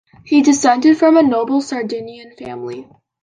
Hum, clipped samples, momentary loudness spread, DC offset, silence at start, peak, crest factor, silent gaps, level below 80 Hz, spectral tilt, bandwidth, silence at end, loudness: none; under 0.1%; 20 LU; under 0.1%; 0.25 s; -2 dBFS; 14 dB; none; -60 dBFS; -4 dB/octave; 9.8 kHz; 0.4 s; -14 LUFS